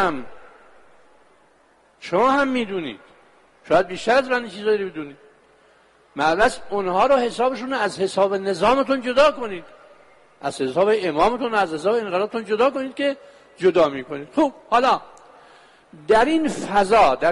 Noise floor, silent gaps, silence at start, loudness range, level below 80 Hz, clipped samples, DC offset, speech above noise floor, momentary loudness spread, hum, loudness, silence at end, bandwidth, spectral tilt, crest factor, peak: -57 dBFS; none; 0 s; 4 LU; -52 dBFS; under 0.1%; under 0.1%; 37 dB; 13 LU; none; -20 LUFS; 0 s; 11.5 kHz; -4.5 dB/octave; 16 dB; -6 dBFS